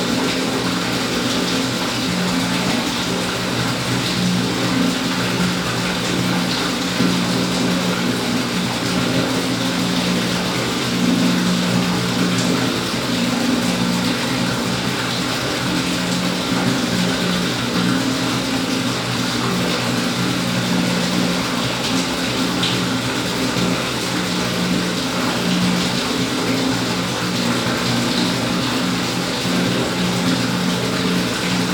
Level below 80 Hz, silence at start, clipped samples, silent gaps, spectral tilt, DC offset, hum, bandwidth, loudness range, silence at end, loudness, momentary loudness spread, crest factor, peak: -46 dBFS; 0 s; under 0.1%; none; -4 dB/octave; under 0.1%; none; over 20 kHz; 1 LU; 0 s; -19 LUFS; 2 LU; 14 dB; -4 dBFS